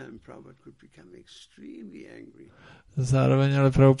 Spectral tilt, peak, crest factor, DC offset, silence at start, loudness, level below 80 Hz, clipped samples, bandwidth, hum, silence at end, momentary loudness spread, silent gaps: -8 dB/octave; -6 dBFS; 20 dB; under 0.1%; 0 s; -22 LUFS; -48 dBFS; under 0.1%; 10.5 kHz; none; 0 s; 27 LU; none